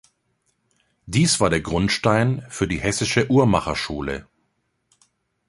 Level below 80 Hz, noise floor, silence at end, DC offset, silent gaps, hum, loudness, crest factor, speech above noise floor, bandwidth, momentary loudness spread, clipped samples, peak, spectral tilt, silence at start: -42 dBFS; -71 dBFS; 1.25 s; under 0.1%; none; none; -21 LUFS; 20 dB; 51 dB; 11.5 kHz; 9 LU; under 0.1%; -2 dBFS; -4.5 dB/octave; 1.05 s